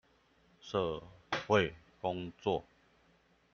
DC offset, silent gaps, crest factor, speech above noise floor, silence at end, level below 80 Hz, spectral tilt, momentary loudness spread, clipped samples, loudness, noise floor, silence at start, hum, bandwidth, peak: under 0.1%; none; 24 dB; 35 dB; 0.95 s; -64 dBFS; -5.5 dB/octave; 10 LU; under 0.1%; -36 LUFS; -69 dBFS; 0.65 s; none; 7 kHz; -14 dBFS